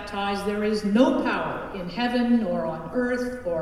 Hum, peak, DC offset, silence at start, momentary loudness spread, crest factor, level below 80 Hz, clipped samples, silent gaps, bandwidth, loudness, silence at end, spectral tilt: none; -6 dBFS; under 0.1%; 0 s; 8 LU; 18 dB; -48 dBFS; under 0.1%; none; 12.5 kHz; -25 LUFS; 0 s; -6 dB/octave